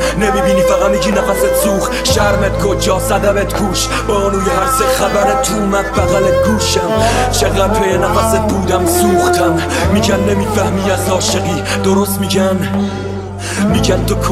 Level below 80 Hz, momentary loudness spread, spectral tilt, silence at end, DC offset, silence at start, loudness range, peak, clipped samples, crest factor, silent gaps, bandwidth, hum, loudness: -26 dBFS; 3 LU; -4.5 dB/octave; 0 s; under 0.1%; 0 s; 2 LU; 0 dBFS; under 0.1%; 12 dB; none; 16 kHz; none; -13 LUFS